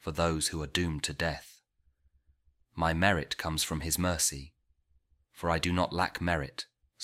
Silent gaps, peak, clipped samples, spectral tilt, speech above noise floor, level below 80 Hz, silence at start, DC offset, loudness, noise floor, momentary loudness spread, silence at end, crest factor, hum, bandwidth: none; -8 dBFS; under 0.1%; -3.5 dB/octave; 40 dB; -48 dBFS; 0.05 s; under 0.1%; -31 LUFS; -71 dBFS; 13 LU; 0 s; 24 dB; none; 16 kHz